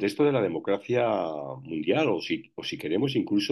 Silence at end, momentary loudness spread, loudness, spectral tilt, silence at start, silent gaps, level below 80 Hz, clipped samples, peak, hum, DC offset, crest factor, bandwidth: 0 s; 9 LU; -27 LUFS; -6 dB/octave; 0 s; none; -70 dBFS; under 0.1%; -12 dBFS; none; under 0.1%; 14 dB; 12.5 kHz